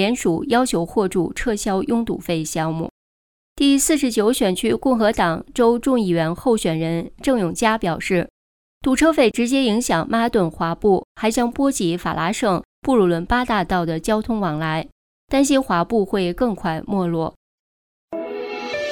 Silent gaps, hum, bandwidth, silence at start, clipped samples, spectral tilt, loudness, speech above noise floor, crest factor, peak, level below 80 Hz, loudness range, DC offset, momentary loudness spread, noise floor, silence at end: 2.91-3.56 s, 8.30-8.81 s, 11.04-11.15 s, 12.65-12.82 s, 14.92-15.28 s, 17.36-18.08 s; none; 19 kHz; 0 s; under 0.1%; -5 dB/octave; -20 LUFS; over 71 dB; 16 dB; -4 dBFS; -42 dBFS; 3 LU; under 0.1%; 8 LU; under -90 dBFS; 0 s